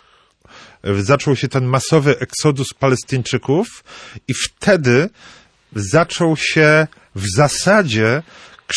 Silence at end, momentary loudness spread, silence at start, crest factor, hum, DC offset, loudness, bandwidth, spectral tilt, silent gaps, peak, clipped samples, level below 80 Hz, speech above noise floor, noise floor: 0 s; 12 LU; 0.85 s; 16 dB; none; under 0.1%; -16 LUFS; 11 kHz; -5 dB/octave; none; -2 dBFS; under 0.1%; -50 dBFS; 36 dB; -52 dBFS